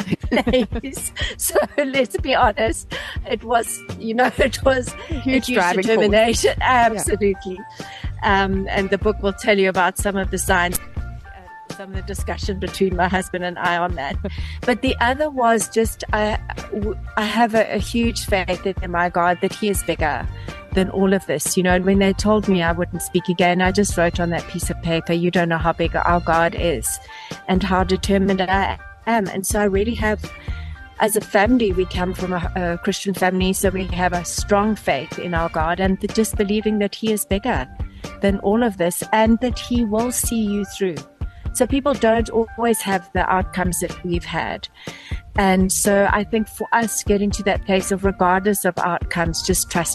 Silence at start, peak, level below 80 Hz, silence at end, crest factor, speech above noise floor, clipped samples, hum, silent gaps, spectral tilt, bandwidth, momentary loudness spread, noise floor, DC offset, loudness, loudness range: 0 s; -4 dBFS; -32 dBFS; 0 s; 16 dB; 20 dB; under 0.1%; none; none; -4.5 dB/octave; 13 kHz; 10 LU; -39 dBFS; under 0.1%; -20 LUFS; 3 LU